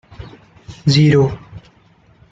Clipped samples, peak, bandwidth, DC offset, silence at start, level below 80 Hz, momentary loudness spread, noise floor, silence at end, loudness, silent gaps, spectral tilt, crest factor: under 0.1%; -2 dBFS; 7.8 kHz; under 0.1%; 0.2 s; -44 dBFS; 26 LU; -51 dBFS; 0.7 s; -14 LUFS; none; -6.5 dB/octave; 16 dB